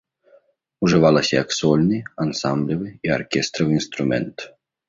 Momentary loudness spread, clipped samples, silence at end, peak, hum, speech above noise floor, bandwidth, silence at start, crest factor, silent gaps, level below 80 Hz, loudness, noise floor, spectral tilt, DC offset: 10 LU; under 0.1%; 0.4 s; -2 dBFS; none; 37 dB; 7.8 kHz; 0.8 s; 18 dB; none; -52 dBFS; -20 LUFS; -57 dBFS; -5.5 dB/octave; under 0.1%